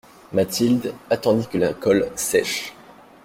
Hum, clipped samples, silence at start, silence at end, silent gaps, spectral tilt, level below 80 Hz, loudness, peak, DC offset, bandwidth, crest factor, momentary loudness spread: none; under 0.1%; 0.3 s; 0.5 s; none; -4.5 dB/octave; -56 dBFS; -21 LUFS; -4 dBFS; under 0.1%; 16.5 kHz; 18 dB; 6 LU